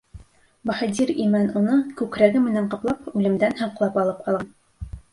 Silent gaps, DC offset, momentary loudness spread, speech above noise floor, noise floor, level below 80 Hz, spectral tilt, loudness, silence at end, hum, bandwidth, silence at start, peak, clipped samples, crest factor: none; under 0.1%; 11 LU; 25 dB; -46 dBFS; -48 dBFS; -6.5 dB/octave; -22 LUFS; 0.15 s; none; 11.5 kHz; 0.15 s; -2 dBFS; under 0.1%; 20 dB